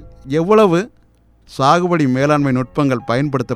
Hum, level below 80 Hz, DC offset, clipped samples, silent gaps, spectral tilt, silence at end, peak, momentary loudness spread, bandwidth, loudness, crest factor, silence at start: none; -46 dBFS; under 0.1%; under 0.1%; none; -7 dB/octave; 0 s; 0 dBFS; 8 LU; 13.5 kHz; -15 LUFS; 16 dB; 0 s